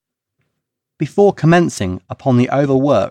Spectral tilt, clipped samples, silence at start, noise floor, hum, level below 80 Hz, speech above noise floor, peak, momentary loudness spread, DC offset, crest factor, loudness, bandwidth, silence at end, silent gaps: -7 dB/octave; under 0.1%; 1 s; -76 dBFS; none; -52 dBFS; 63 dB; -2 dBFS; 10 LU; under 0.1%; 14 dB; -15 LUFS; 12 kHz; 0 s; none